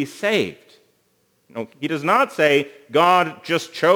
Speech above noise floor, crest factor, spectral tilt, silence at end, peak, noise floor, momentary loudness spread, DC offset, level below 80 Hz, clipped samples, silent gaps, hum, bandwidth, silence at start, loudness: 45 dB; 18 dB; -4.5 dB/octave; 0 s; -2 dBFS; -64 dBFS; 14 LU; under 0.1%; -74 dBFS; under 0.1%; none; none; over 20 kHz; 0 s; -19 LUFS